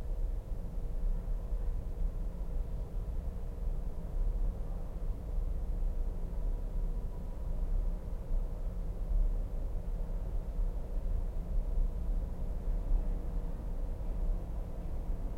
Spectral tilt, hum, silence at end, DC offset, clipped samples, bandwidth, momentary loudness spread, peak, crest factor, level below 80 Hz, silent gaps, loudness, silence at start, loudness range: -8.5 dB/octave; none; 0 s; under 0.1%; under 0.1%; 2.5 kHz; 5 LU; -20 dBFS; 14 dB; -34 dBFS; none; -40 LUFS; 0 s; 2 LU